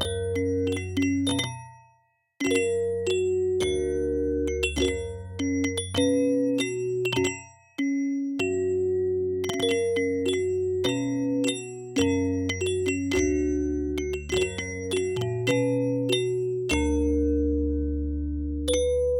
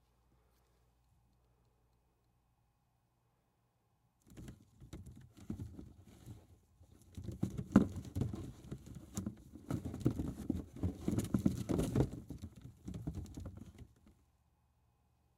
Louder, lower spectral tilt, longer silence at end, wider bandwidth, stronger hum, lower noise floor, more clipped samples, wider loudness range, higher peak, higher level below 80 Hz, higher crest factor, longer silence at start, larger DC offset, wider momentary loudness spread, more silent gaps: first, -26 LUFS vs -40 LUFS; second, -5 dB/octave vs -7.5 dB/octave; second, 0 s vs 1.25 s; about the same, 16 kHz vs 16 kHz; neither; second, -66 dBFS vs -78 dBFS; neither; second, 1 LU vs 16 LU; about the same, -8 dBFS vs -10 dBFS; first, -38 dBFS vs -56 dBFS; second, 18 dB vs 32 dB; second, 0 s vs 4.3 s; neither; second, 5 LU vs 22 LU; neither